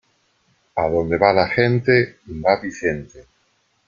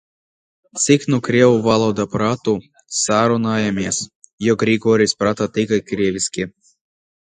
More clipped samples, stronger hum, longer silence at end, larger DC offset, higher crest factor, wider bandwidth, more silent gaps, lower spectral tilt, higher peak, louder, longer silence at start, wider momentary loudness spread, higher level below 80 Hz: neither; neither; second, 0.65 s vs 0.8 s; neither; about the same, 20 dB vs 18 dB; second, 7.4 kHz vs 9.6 kHz; second, none vs 4.15-4.22 s, 4.33-4.38 s; first, -7 dB/octave vs -4.5 dB/octave; about the same, -2 dBFS vs 0 dBFS; about the same, -19 LUFS vs -18 LUFS; about the same, 0.75 s vs 0.75 s; about the same, 10 LU vs 9 LU; about the same, -48 dBFS vs -52 dBFS